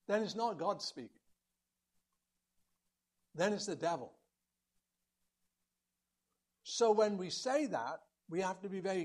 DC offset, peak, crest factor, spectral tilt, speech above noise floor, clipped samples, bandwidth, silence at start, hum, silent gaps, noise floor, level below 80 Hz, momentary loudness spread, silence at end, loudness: under 0.1%; -18 dBFS; 20 dB; -4 dB/octave; 53 dB; under 0.1%; 12 kHz; 0.1 s; 60 Hz at -80 dBFS; none; -89 dBFS; -86 dBFS; 19 LU; 0 s; -37 LUFS